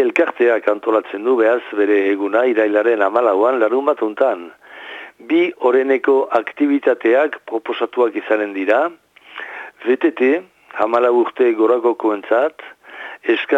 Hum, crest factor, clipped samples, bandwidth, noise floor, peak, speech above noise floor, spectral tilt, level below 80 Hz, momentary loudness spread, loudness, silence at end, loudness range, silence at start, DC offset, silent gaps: none; 14 dB; under 0.1%; 7.6 kHz; -35 dBFS; -2 dBFS; 19 dB; -5.5 dB/octave; -72 dBFS; 16 LU; -17 LUFS; 0 s; 3 LU; 0 s; under 0.1%; none